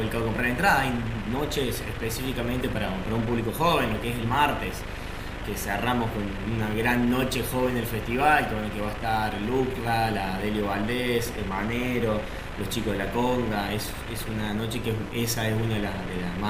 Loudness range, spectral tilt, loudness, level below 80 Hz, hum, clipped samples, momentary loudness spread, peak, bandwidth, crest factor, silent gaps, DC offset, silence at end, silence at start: 3 LU; -5 dB/octave; -27 LUFS; -38 dBFS; none; under 0.1%; 8 LU; -8 dBFS; 16 kHz; 20 dB; none; under 0.1%; 0 s; 0 s